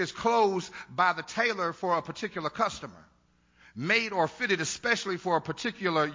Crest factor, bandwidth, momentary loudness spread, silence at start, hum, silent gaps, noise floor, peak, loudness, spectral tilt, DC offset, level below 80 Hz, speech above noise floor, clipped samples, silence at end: 18 dB; 7.6 kHz; 10 LU; 0 s; none; none; -66 dBFS; -10 dBFS; -29 LUFS; -4 dB/octave; under 0.1%; -64 dBFS; 37 dB; under 0.1%; 0 s